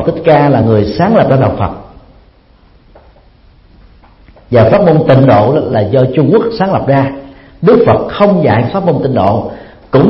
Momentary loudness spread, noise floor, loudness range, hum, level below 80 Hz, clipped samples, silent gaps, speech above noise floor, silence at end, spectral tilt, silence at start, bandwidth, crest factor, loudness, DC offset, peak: 7 LU; -44 dBFS; 7 LU; none; -38 dBFS; 0.3%; none; 35 dB; 0 s; -10.5 dB/octave; 0 s; 5.8 kHz; 10 dB; -9 LUFS; under 0.1%; 0 dBFS